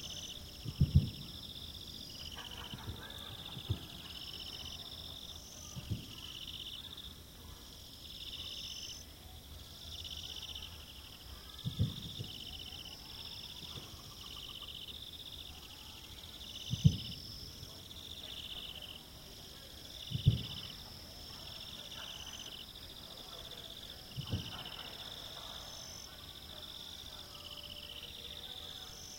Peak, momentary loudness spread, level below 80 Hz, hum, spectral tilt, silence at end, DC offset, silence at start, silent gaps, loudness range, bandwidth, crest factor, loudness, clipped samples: -12 dBFS; 11 LU; -54 dBFS; none; -4.5 dB/octave; 0 s; under 0.1%; 0 s; none; 6 LU; 16.5 kHz; 30 dB; -43 LUFS; under 0.1%